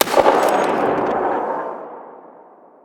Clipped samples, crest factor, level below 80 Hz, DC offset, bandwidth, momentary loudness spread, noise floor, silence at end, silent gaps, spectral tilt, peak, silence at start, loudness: under 0.1%; 18 dB; -56 dBFS; under 0.1%; over 20 kHz; 19 LU; -46 dBFS; 0.6 s; none; -3.5 dB/octave; 0 dBFS; 0 s; -18 LUFS